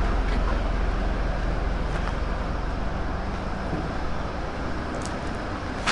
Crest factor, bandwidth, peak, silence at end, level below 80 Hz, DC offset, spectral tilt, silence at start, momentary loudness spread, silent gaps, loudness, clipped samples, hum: 16 dB; 10.5 kHz; -10 dBFS; 0 s; -28 dBFS; under 0.1%; -6 dB/octave; 0 s; 4 LU; none; -29 LUFS; under 0.1%; none